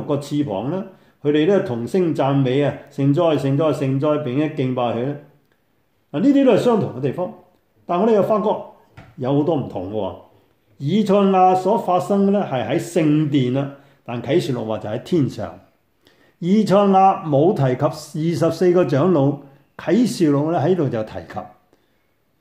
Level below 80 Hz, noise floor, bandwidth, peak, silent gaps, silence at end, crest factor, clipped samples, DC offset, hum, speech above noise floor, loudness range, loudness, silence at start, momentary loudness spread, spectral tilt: -62 dBFS; -65 dBFS; 15.5 kHz; -2 dBFS; none; 0.95 s; 16 dB; under 0.1%; under 0.1%; none; 47 dB; 4 LU; -19 LUFS; 0 s; 13 LU; -7.5 dB/octave